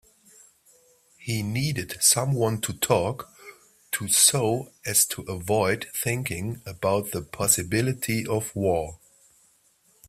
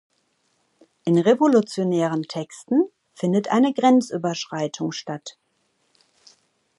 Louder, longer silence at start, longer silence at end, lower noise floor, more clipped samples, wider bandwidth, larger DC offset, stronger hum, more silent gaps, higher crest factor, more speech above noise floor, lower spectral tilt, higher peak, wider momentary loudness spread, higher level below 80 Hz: second, -24 LUFS vs -21 LUFS; first, 1.2 s vs 1.05 s; second, 1.1 s vs 1.5 s; second, -63 dBFS vs -69 dBFS; neither; first, 16 kHz vs 11.5 kHz; neither; neither; neither; first, 24 dB vs 18 dB; second, 38 dB vs 48 dB; second, -3.5 dB/octave vs -6 dB/octave; about the same, -4 dBFS vs -6 dBFS; about the same, 13 LU vs 14 LU; first, -56 dBFS vs -74 dBFS